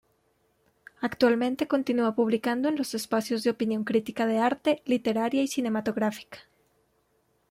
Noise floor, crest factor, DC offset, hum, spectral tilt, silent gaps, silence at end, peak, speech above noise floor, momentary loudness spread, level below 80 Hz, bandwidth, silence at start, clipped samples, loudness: -70 dBFS; 18 dB; under 0.1%; none; -5 dB/octave; none; 1.1 s; -10 dBFS; 44 dB; 5 LU; -70 dBFS; 16 kHz; 1 s; under 0.1%; -27 LUFS